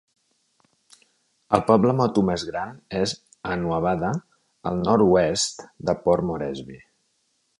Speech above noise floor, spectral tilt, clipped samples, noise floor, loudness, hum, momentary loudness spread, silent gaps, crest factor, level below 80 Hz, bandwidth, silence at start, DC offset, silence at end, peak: 48 dB; -5.5 dB/octave; under 0.1%; -70 dBFS; -23 LUFS; none; 14 LU; none; 24 dB; -50 dBFS; 11.5 kHz; 1.5 s; under 0.1%; 0.8 s; 0 dBFS